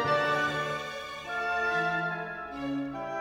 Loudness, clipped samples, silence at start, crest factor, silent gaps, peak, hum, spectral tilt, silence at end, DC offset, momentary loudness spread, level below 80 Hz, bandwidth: -31 LUFS; under 0.1%; 0 s; 14 dB; none; -16 dBFS; none; -5 dB/octave; 0 s; under 0.1%; 10 LU; -60 dBFS; 19.5 kHz